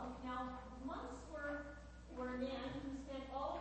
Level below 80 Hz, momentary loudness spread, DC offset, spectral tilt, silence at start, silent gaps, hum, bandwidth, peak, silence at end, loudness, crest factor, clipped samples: -58 dBFS; 6 LU; under 0.1%; -6 dB/octave; 0 s; none; none; 8.4 kHz; -32 dBFS; 0 s; -47 LUFS; 16 dB; under 0.1%